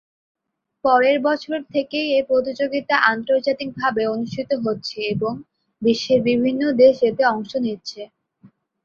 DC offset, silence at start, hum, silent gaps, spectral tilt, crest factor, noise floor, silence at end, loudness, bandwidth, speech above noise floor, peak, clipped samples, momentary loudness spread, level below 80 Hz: under 0.1%; 0.85 s; none; none; -5.5 dB/octave; 18 dB; -54 dBFS; 0.35 s; -20 LUFS; 7 kHz; 34 dB; -2 dBFS; under 0.1%; 10 LU; -60 dBFS